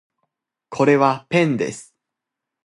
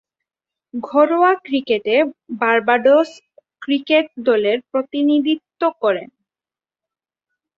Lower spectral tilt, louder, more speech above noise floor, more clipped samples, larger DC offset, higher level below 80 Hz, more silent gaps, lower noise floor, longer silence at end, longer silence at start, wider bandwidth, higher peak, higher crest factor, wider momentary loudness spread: about the same, -6 dB/octave vs -5.5 dB/octave; about the same, -18 LUFS vs -17 LUFS; second, 66 dB vs over 73 dB; neither; neither; about the same, -64 dBFS vs -68 dBFS; neither; second, -84 dBFS vs under -90 dBFS; second, 0.85 s vs 1.5 s; about the same, 0.7 s vs 0.75 s; first, 11.5 kHz vs 7.6 kHz; about the same, -2 dBFS vs -2 dBFS; about the same, 20 dB vs 16 dB; first, 17 LU vs 9 LU